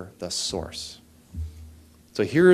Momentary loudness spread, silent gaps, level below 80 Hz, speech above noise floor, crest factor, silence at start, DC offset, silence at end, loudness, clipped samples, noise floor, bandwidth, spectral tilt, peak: 22 LU; none; -46 dBFS; 27 dB; 20 dB; 0 s; under 0.1%; 0 s; -28 LUFS; under 0.1%; -50 dBFS; 14 kHz; -5 dB/octave; -6 dBFS